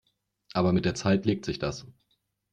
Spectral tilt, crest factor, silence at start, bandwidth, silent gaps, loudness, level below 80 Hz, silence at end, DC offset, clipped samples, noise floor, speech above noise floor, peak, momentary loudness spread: -6 dB/octave; 18 dB; 0.55 s; 9.2 kHz; none; -28 LUFS; -54 dBFS; 0.65 s; under 0.1%; under 0.1%; -75 dBFS; 48 dB; -12 dBFS; 9 LU